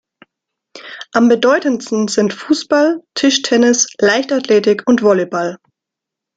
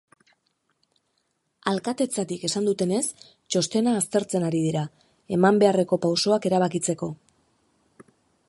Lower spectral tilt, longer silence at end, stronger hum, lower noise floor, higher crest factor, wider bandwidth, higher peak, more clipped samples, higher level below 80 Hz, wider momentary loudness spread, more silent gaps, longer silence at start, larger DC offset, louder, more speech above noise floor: second, -3.5 dB/octave vs -5 dB/octave; second, 0.8 s vs 1.35 s; neither; first, -83 dBFS vs -74 dBFS; second, 14 dB vs 22 dB; second, 9.4 kHz vs 12 kHz; first, 0 dBFS vs -4 dBFS; neither; first, -60 dBFS vs -68 dBFS; about the same, 8 LU vs 10 LU; neither; second, 0.75 s vs 1.65 s; neither; first, -14 LUFS vs -24 LUFS; first, 69 dB vs 50 dB